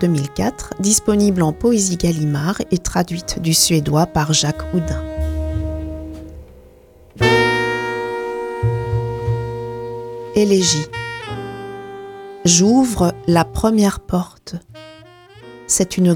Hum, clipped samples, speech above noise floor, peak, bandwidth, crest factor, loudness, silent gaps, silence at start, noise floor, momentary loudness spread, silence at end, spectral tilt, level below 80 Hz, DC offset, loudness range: none; under 0.1%; 30 dB; 0 dBFS; 18 kHz; 18 dB; -18 LUFS; none; 0 s; -46 dBFS; 16 LU; 0 s; -4.5 dB/octave; -34 dBFS; under 0.1%; 4 LU